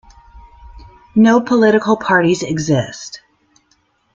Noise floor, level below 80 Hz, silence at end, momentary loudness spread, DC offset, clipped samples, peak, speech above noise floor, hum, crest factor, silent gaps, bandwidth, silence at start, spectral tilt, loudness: -60 dBFS; -46 dBFS; 1 s; 18 LU; under 0.1%; under 0.1%; -2 dBFS; 46 dB; none; 14 dB; none; 7.8 kHz; 0.35 s; -5.5 dB/octave; -14 LUFS